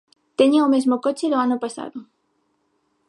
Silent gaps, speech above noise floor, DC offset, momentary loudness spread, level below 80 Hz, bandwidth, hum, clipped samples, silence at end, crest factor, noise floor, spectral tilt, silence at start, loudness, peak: none; 50 dB; under 0.1%; 17 LU; -76 dBFS; 11.5 kHz; none; under 0.1%; 1.05 s; 18 dB; -69 dBFS; -4 dB/octave; 0.4 s; -19 LUFS; -4 dBFS